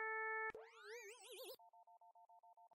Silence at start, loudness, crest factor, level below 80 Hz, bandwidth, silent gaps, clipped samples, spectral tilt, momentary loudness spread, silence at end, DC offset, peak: 0 s; -49 LUFS; 16 dB; under -90 dBFS; 16 kHz; none; under 0.1%; -0.5 dB/octave; 24 LU; 0 s; under 0.1%; -36 dBFS